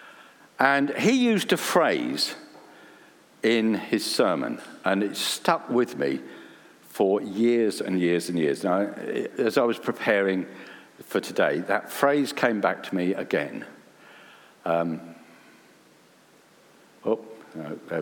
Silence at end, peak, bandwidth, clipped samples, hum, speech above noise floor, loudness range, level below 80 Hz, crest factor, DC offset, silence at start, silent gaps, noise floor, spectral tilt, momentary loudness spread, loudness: 0 s; -4 dBFS; 19.5 kHz; under 0.1%; none; 32 dB; 9 LU; -78 dBFS; 22 dB; under 0.1%; 0 s; none; -57 dBFS; -4.5 dB/octave; 15 LU; -25 LUFS